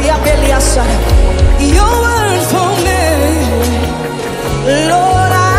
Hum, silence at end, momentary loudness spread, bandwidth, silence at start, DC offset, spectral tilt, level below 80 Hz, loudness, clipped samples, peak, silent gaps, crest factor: none; 0 s; 6 LU; 15.5 kHz; 0 s; under 0.1%; -5 dB/octave; -14 dBFS; -11 LUFS; 0.2%; 0 dBFS; none; 10 dB